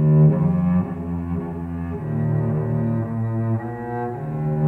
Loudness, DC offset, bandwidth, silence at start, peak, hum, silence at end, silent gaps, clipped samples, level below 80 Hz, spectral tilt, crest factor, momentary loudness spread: -22 LUFS; under 0.1%; 2.8 kHz; 0 s; -6 dBFS; none; 0 s; none; under 0.1%; -44 dBFS; -12 dB/octave; 16 dB; 11 LU